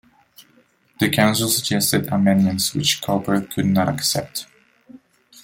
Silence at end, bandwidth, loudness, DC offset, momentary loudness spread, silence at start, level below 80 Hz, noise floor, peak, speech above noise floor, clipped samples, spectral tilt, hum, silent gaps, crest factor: 0 s; 17 kHz; -19 LUFS; under 0.1%; 6 LU; 0.4 s; -56 dBFS; -58 dBFS; -2 dBFS; 39 dB; under 0.1%; -4 dB/octave; none; none; 18 dB